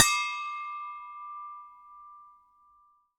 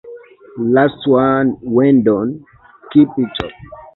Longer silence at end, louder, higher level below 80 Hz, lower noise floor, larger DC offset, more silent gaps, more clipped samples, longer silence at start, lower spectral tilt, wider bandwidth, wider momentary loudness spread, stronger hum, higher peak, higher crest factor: first, 0.9 s vs 0.15 s; second, -32 LUFS vs -15 LUFS; second, -68 dBFS vs -48 dBFS; first, -64 dBFS vs -37 dBFS; neither; neither; neither; about the same, 0 s vs 0.05 s; second, 2 dB/octave vs -9.5 dB/octave; first, 18 kHz vs 4.1 kHz; first, 22 LU vs 14 LU; neither; about the same, -2 dBFS vs 0 dBFS; first, 32 dB vs 14 dB